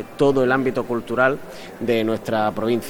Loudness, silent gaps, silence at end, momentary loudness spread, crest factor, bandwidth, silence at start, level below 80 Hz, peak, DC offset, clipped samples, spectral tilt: -21 LUFS; none; 0 s; 9 LU; 16 dB; 19.5 kHz; 0 s; -50 dBFS; -4 dBFS; under 0.1%; under 0.1%; -6 dB/octave